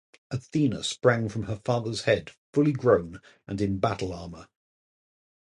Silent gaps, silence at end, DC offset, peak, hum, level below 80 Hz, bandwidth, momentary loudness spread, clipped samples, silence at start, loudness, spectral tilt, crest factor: 2.38-2.53 s; 1.05 s; under 0.1%; -6 dBFS; none; -52 dBFS; 11.5 kHz; 14 LU; under 0.1%; 0.3 s; -27 LUFS; -6 dB/octave; 20 dB